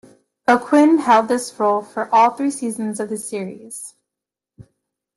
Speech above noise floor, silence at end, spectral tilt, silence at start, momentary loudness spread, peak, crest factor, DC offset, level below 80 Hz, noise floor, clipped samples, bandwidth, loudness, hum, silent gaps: 68 dB; 0.55 s; -4.5 dB/octave; 0.5 s; 17 LU; -2 dBFS; 18 dB; under 0.1%; -66 dBFS; -86 dBFS; under 0.1%; 12.5 kHz; -18 LUFS; none; none